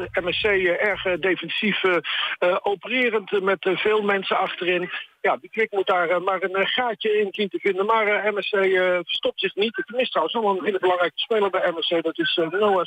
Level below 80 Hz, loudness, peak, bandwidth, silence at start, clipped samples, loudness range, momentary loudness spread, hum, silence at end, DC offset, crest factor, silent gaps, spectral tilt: -60 dBFS; -22 LUFS; -10 dBFS; 9 kHz; 0 s; under 0.1%; 1 LU; 4 LU; none; 0 s; under 0.1%; 14 dB; none; -5.5 dB/octave